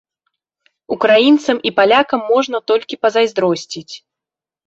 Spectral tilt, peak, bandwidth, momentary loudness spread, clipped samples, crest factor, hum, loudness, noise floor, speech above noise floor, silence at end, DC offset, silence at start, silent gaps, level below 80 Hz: -4 dB/octave; 0 dBFS; 8 kHz; 16 LU; under 0.1%; 16 dB; none; -14 LUFS; -87 dBFS; 73 dB; 0.7 s; under 0.1%; 0.9 s; none; -62 dBFS